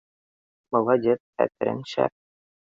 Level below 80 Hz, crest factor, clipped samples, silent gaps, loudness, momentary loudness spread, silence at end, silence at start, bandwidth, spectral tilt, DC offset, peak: -68 dBFS; 20 dB; under 0.1%; 1.20-1.33 s; -25 LUFS; 6 LU; 0.65 s; 0.7 s; 7.6 kHz; -7 dB/octave; under 0.1%; -6 dBFS